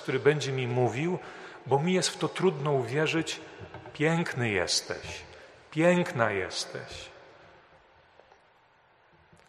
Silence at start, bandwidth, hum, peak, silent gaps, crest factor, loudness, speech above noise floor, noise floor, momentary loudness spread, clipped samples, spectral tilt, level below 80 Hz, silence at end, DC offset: 0 s; 13 kHz; none; -8 dBFS; none; 22 dB; -28 LUFS; 34 dB; -63 dBFS; 18 LU; under 0.1%; -4.5 dB/octave; -64 dBFS; 2.25 s; under 0.1%